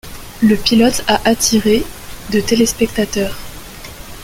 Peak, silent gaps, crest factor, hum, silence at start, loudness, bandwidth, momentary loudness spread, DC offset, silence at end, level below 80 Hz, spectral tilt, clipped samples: 0 dBFS; none; 16 dB; none; 0.05 s; -14 LUFS; 17 kHz; 20 LU; under 0.1%; 0 s; -34 dBFS; -3.5 dB/octave; under 0.1%